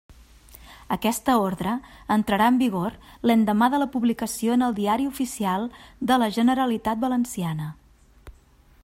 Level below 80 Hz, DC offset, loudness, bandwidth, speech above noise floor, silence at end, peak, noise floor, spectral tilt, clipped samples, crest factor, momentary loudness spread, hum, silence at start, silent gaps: -52 dBFS; under 0.1%; -23 LUFS; 16 kHz; 32 dB; 0.55 s; -6 dBFS; -55 dBFS; -5 dB/octave; under 0.1%; 18 dB; 10 LU; none; 0.55 s; none